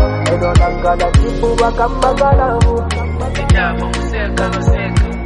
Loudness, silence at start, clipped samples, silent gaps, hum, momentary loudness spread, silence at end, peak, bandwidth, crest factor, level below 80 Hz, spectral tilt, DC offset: -14 LUFS; 0 s; under 0.1%; none; none; 7 LU; 0 s; 0 dBFS; 11.5 kHz; 12 dB; -18 dBFS; -6 dB/octave; under 0.1%